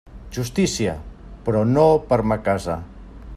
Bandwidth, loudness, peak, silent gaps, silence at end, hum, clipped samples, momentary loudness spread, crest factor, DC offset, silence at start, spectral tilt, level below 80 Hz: 14 kHz; -21 LUFS; -2 dBFS; none; 0 s; none; under 0.1%; 18 LU; 18 dB; under 0.1%; 0.05 s; -6 dB/octave; -40 dBFS